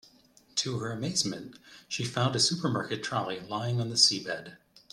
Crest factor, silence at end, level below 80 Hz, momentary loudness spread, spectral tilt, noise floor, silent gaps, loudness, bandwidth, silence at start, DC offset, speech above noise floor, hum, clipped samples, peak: 24 dB; 0.35 s; -68 dBFS; 15 LU; -3 dB/octave; -61 dBFS; none; -29 LUFS; 13.5 kHz; 0.55 s; under 0.1%; 31 dB; none; under 0.1%; -6 dBFS